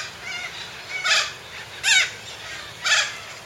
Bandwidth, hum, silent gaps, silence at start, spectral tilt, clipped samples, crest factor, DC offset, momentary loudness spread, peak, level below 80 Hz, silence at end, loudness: 16.5 kHz; none; none; 0 s; 1.5 dB/octave; under 0.1%; 20 dB; under 0.1%; 16 LU; -6 dBFS; -60 dBFS; 0 s; -21 LUFS